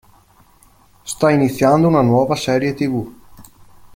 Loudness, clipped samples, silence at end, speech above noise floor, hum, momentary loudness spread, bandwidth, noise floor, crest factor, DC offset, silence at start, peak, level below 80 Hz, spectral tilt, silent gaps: -16 LUFS; under 0.1%; 0.55 s; 36 dB; none; 15 LU; 17 kHz; -51 dBFS; 16 dB; under 0.1%; 1.05 s; -2 dBFS; -50 dBFS; -6.5 dB/octave; none